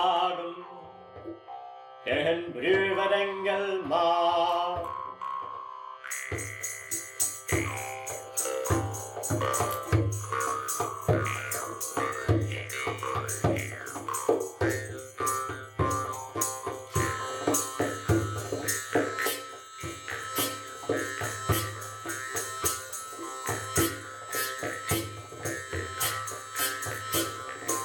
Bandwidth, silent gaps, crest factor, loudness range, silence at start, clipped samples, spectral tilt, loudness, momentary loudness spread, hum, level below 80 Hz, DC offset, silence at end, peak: 19.5 kHz; none; 18 dB; 4 LU; 0 s; under 0.1%; -3.5 dB/octave; -30 LUFS; 10 LU; none; -52 dBFS; under 0.1%; 0 s; -12 dBFS